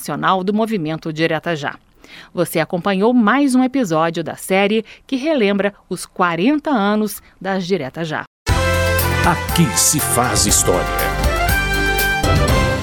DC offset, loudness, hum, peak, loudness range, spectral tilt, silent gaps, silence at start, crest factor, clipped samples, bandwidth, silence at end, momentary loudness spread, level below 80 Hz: under 0.1%; -17 LUFS; none; 0 dBFS; 4 LU; -4 dB/octave; 8.27-8.46 s; 0 s; 16 dB; under 0.1%; 19.5 kHz; 0 s; 10 LU; -28 dBFS